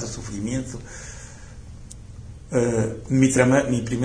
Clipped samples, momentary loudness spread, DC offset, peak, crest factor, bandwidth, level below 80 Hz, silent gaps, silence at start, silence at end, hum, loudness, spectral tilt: under 0.1%; 24 LU; under 0.1%; -4 dBFS; 20 dB; 10.5 kHz; -42 dBFS; none; 0 s; 0 s; none; -22 LUFS; -6 dB/octave